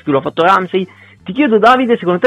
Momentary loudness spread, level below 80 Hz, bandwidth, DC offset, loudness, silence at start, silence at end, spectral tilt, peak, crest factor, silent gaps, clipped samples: 15 LU; -54 dBFS; 12.5 kHz; under 0.1%; -12 LUFS; 0.05 s; 0 s; -6.5 dB/octave; 0 dBFS; 12 dB; none; under 0.1%